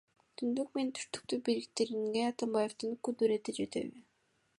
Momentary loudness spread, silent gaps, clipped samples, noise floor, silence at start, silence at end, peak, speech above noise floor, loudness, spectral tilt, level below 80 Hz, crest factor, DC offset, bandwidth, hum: 7 LU; none; under 0.1%; -76 dBFS; 0.4 s; 0.6 s; -18 dBFS; 41 dB; -36 LUFS; -4 dB/octave; -78 dBFS; 18 dB; under 0.1%; 11.5 kHz; none